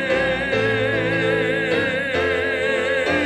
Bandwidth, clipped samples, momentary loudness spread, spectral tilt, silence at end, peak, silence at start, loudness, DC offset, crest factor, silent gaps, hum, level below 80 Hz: 12.5 kHz; under 0.1%; 1 LU; -5.5 dB/octave; 0 s; -6 dBFS; 0 s; -20 LUFS; under 0.1%; 14 dB; none; none; -46 dBFS